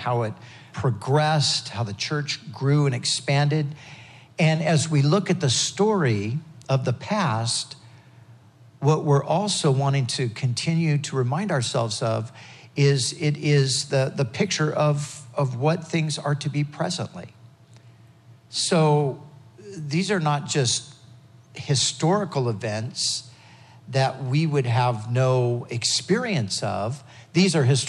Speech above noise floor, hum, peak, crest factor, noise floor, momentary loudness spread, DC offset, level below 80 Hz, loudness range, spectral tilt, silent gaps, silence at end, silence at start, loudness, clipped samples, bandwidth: 28 dB; none; -6 dBFS; 18 dB; -51 dBFS; 10 LU; under 0.1%; -70 dBFS; 4 LU; -5 dB/octave; none; 0 s; 0 s; -23 LUFS; under 0.1%; 11.5 kHz